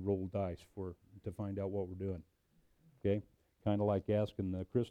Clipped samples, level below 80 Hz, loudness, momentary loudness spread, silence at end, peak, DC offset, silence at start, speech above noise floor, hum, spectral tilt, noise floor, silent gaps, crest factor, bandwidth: under 0.1%; -64 dBFS; -39 LUFS; 13 LU; 0 s; -22 dBFS; under 0.1%; 0 s; 35 dB; none; -9.5 dB/octave; -72 dBFS; none; 18 dB; 9.4 kHz